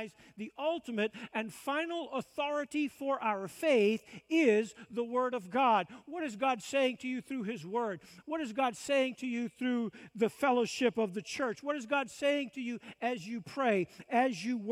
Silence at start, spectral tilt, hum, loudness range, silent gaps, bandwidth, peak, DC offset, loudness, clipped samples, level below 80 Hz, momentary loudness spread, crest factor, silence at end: 0 s; -4.5 dB/octave; none; 4 LU; none; 15.5 kHz; -14 dBFS; under 0.1%; -33 LUFS; under 0.1%; -78 dBFS; 10 LU; 18 dB; 0 s